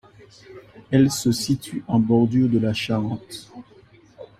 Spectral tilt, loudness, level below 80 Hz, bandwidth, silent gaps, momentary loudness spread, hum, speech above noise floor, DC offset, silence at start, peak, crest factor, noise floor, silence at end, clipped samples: -6 dB/octave; -21 LUFS; -54 dBFS; 16 kHz; none; 12 LU; none; 30 dB; under 0.1%; 0.5 s; -4 dBFS; 18 dB; -51 dBFS; 0.15 s; under 0.1%